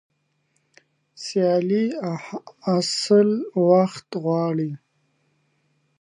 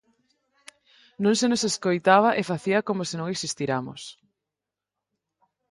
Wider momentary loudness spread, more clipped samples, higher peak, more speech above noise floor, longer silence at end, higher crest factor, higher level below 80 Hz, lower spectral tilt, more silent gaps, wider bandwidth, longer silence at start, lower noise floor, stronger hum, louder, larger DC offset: about the same, 13 LU vs 11 LU; neither; about the same, -6 dBFS vs -4 dBFS; second, 49 dB vs 64 dB; second, 1.25 s vs 1.6 s; about the same, 18 dB vs 22 dB; second, -76 dBFS vs -70 dBFS; first, -6 dB/octave vs -4 dB/octave; neither; about the same, 11.5 kHz vs 11.5 kHz; about the same, 1.2 s vs 1.2 s; second, -70 dBFS vs -88 dBFS; neither; about the same, -22 LUFS vs -24 LUFS; neither